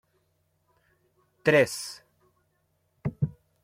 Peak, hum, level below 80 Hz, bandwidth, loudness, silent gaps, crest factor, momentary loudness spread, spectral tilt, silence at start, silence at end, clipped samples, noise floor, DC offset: -8 dBFS; none; -60 dBFS; 16 kHz; -27 LUFS; none; 24 dB; 17 LU; -5 dB/octave; 1.45 s; 0.3 s; under 0.1%; -73 dBFS; under 0.1%